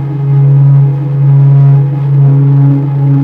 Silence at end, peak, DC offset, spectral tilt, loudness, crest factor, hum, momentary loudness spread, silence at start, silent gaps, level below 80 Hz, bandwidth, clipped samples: 0 s; 0 dBFS; under 0.1%; -12.5 dB/octave; -7 LUFS; 6 dB; none; 5 LU; 0 s; none; -44 dBFS; 2.5 kHz; under 0.1%